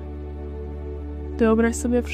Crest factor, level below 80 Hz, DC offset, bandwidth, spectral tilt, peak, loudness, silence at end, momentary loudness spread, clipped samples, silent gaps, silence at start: 16 dB; -32 dBFS; under 0.1%; 15 kHz; -6.5 dB/octave; -8 dBFS; -24 LUFS; 0 s; 15 LU; under 0.1%; none; 0 s